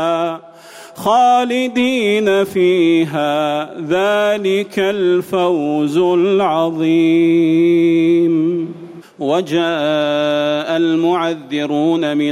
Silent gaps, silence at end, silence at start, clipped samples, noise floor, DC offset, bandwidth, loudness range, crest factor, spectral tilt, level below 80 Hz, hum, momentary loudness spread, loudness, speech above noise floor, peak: none; 0 s; 0 s; under 0.1%; -38 dBFS; under 0.1%; 14 kHz; 3 LU; 10 dB; -6 dB/octave; -60 dBFS; none; 7 LU; -15 LUFS; 24 dB; -4 dBFS